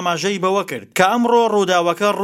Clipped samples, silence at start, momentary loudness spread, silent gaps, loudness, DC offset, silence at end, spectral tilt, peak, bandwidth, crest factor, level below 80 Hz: under 0.1%; 0 s; 5 LU; none; -17 LUFS; under 0.1%; 0 s; -4 dB/octave; 0 dBFS; 16.5 kHz; 16 dB; -66 dBFS